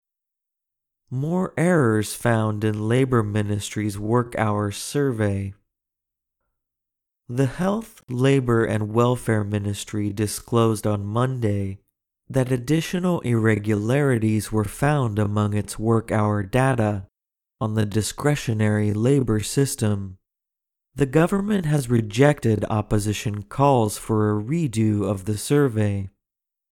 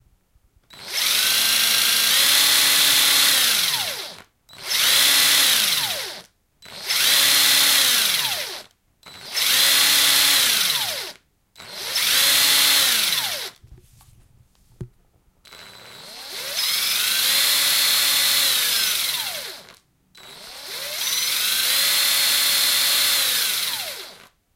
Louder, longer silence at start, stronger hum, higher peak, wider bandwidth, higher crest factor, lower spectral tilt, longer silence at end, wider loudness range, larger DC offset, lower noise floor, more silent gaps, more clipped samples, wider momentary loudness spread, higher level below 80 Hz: second, -22 LUFS vs -16 LUFS; first, 1.1 s vs 0.75 s; neither; about the same, -2 dBFS vs -2 dBFS; about the same, 16 kHz vs 16 kHz; about the same, 20 dB vs 18 dB; first, -6.5 dB/octave vs 2 dB/octave; first, 0.65 s vs 0.4 s; second, 4 LU vs 7 LU; neither; first, -87 dBFS vs -60 dBFS; neither; neither; second, 8 LU vs 17 LU; first, -48 dBFS vs -60 dBFS